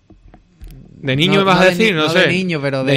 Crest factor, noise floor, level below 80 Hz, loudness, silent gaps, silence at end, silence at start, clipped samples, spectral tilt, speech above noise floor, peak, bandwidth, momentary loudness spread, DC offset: 14 dB; -45 dBFS; -44 dBFS; -13 LUFS; none; 0 s; 0.6 s; under 0.1%; -5.5 dB/octave; 32 dB; -2 dBFS; 14.5 kHz; 8 LU; under 0.1%